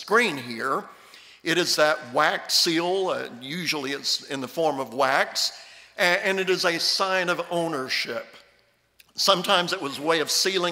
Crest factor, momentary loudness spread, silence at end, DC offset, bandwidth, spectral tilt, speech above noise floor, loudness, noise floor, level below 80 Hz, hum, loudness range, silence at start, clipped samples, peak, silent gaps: 20 dB; 10 LU; 0 s; under 0.1%; 16 kHz; -2 dB/octave; 39 dB; -23 LUFS; -63 dBFS; -74 dBFS; none; 2 LU; 0 s; under 0.1%; -6 dBFS; none